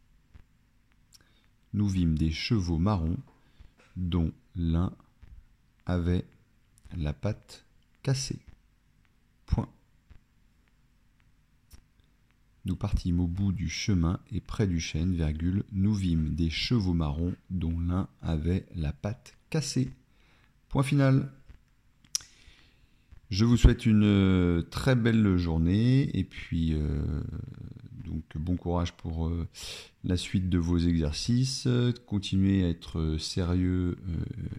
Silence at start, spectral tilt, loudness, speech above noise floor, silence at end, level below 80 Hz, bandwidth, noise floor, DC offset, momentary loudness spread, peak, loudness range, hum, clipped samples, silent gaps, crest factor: 0.35 s; -6.5 dB/octave; -29 LUFS; 38 dB; 0 s; -42 dBFS; 13 kHz; -65 dBFS; under 0.1%; 13 LU; -4 dBFS; 11 LU; none; under 0.1%; none; 26 dB